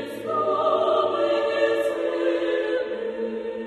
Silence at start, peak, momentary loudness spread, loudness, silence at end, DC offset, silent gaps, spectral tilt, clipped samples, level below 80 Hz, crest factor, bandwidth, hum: 0 s; -8 dBFS; 8 LU; -24 LUFS; 0 s; under 0.1%; none; -5 dB/octave; under 0.1%; -64 dBFS; 16 dB; 13 kHz; none